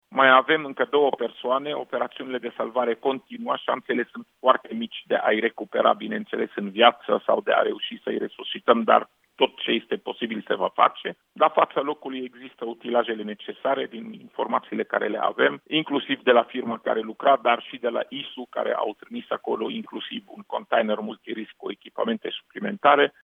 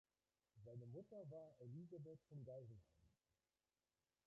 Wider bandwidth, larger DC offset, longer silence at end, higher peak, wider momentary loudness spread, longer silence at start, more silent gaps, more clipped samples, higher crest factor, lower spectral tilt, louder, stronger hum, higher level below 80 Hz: second, 3.9 kHz vs 6.2 kHz; neither; second, 0.15 s vs 1.15 s; first, -2 dBFS vs -48 dBFS; first, 15 LU vs 6 LU; second, 0.1 s vs 0.55 s; neither; neither; first, 22 dB vs 14 dB; second, -6.5 dB/octave vs -11 dB/octave; first, -24 LUFS vs -60 LUFS; neither; about the same, -82 dBFS vs -86 dBFS